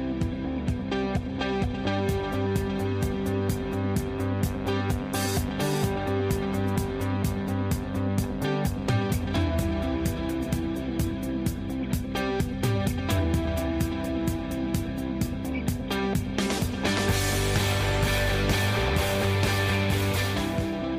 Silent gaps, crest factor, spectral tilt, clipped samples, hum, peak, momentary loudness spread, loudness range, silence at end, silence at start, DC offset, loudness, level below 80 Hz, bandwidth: none; 14 dB; -5.5 dB/octave; under 0.1%; none; -14 dBFS; 5 LU; 4 LU; 0 s; 0 s; under 0.1%; -27 LUFS; -36 dBFS; 15.5 kHz